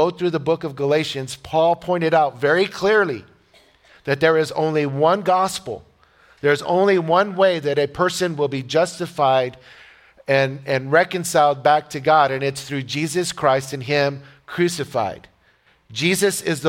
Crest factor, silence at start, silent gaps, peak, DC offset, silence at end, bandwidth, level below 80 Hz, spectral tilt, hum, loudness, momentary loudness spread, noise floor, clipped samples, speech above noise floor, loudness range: 18 dB; 0 s; none; -2 dBFS; under 0.1%; 0 s; 17 kHz; -58 dBFS; -4.5 dB/octave; none; -19 LUFS; 9 LU; -58 dBFS; under 0.1%; 39 dB; 3 LU